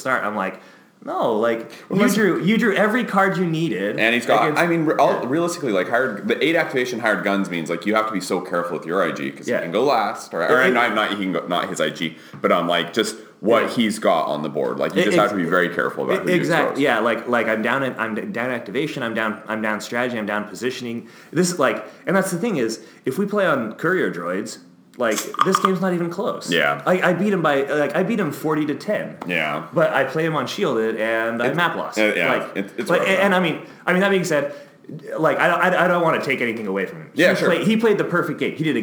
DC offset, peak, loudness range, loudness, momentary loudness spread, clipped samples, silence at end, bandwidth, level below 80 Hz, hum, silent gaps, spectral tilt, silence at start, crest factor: under 0.1%; -2 dBFS; 4 LU; -20 LUFS; 8 LU; under 0.1%; 0 s; over 20 kHz; -76 dBFS; none; none; -5 dB/octave; 0 s; 18 dB